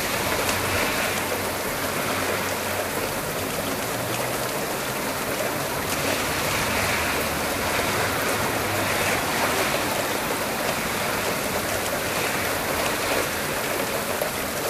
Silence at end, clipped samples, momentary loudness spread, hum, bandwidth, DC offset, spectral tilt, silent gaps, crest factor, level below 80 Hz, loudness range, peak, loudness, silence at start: 0 s; under 0.1%; 4 LU; none; 16 kHz; under 0.1%; -2.5 dB/octave; none; 18 dB; -48 dBFS; 3 LU; -8 dBFS; -24 LUFS; 0 s